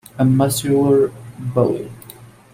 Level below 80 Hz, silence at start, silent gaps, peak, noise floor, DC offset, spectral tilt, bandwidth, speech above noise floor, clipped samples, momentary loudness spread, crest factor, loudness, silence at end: -52 dBFS; 0.15 s; none; -2 dBFS; -42 dBFS; under 0.1%; -6.5 dB/octave; 16 kHz; 25 dB; under 0.1%; 16 LU; 16 dB; -17 LUFS; 0.3 s